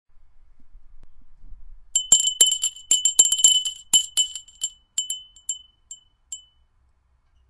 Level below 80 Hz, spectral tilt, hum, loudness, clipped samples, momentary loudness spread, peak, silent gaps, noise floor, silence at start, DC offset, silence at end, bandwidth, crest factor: -52 dBFS; 3 dB/octave; none; -18 LUFS; under 0.1%; 19 LU; 0 dBFS; none; -63 dBFS; 0.6 s; under 0.1%; 1.15 s; 11.5 kHz; 24 dB